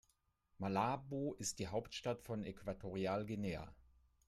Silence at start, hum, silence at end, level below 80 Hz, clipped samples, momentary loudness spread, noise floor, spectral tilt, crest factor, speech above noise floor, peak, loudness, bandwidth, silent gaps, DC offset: 0.6 s; none; 0.45 s; -66 dBFS; under 0.1%; 8 LU; -80 dBFS; -5 dB/octave; 18 dB; 38 dB; -24 dBFS; -43 LUFS; 14.5 kHz; none; under 0.1%